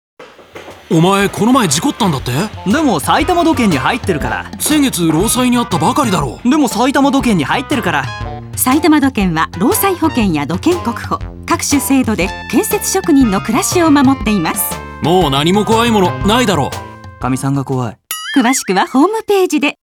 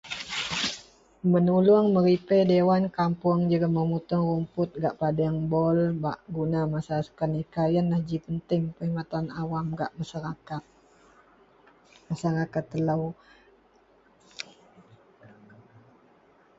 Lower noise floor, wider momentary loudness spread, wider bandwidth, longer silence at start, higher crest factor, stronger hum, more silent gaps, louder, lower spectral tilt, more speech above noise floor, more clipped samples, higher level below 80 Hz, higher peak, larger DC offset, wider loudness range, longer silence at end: second, -34 dBFS vs -61 dBFS; second, 8 LU vs 14 LU; first, 20 kHz vs 7.8 kHz; first, 0.2 s vs 0.05 s; about the same, 14 dB vs 18 dB; neither; neither; first, -13 LUFS vs -26 LUFS; second, -4.5 dB/octave vs -7 dB/octave; second, 22 dB vs 36 dB; neither; first, -34 dBFS vs -58 dBFS; first, 0 dBFS vs -10 dBFS; neither; second, 2 LU vs 11 LU; second, 0.2 s vs 2.15 s